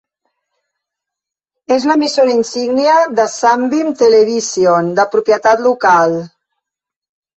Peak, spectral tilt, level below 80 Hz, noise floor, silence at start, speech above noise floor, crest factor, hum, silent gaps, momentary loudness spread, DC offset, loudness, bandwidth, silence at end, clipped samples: 0 dBFS; -4 dB/octave; -60 dBFS; -84 dBFS; 1.7 s; 72 dB; 12 dB; none; none; 5 LU; under 0.1%; -12 LUFS; 8.4 kHz; 1.1 s; under 0.1%